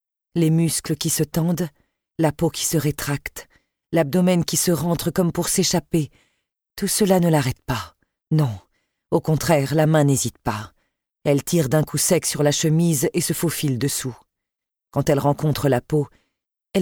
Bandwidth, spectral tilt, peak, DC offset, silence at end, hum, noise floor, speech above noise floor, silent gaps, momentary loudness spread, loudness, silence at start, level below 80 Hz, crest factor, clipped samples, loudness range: 19.5 kHz; -5 dB/octave; -2 dBFS; under 0.1%; 0 s; none; -85 dBFS; 65 dB; none; 10 LU; -21 LUFS; 0.35 s; -48 dBFS; 18 dB; under 0.1%; 3 LU